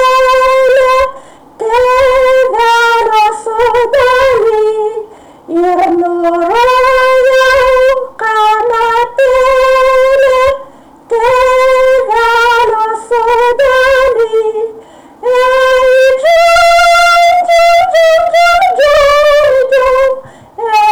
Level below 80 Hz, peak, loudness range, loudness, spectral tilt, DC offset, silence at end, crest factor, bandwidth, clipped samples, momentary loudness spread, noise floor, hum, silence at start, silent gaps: -36 dBFS; -4 dBFS; 4 LU; -8 LUFS; -2.5 dB/octave; under 0.1%; 0 s; 4 dB; 19.5 kHz; under 0.1%; 7 LU; -34 dBFS; none; 0 s; none